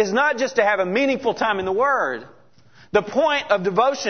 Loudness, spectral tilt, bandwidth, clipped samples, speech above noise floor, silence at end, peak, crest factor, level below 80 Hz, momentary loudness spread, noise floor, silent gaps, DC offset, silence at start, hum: -20 LUFS; -4 dB/octave; 6.6 kHz; under 0.1%; 33 dB; 0 s; -4 dBFS; 16 dB; -60 dBFS; 4 LU; -53 dBFS; none; 0.2%; 0 s; none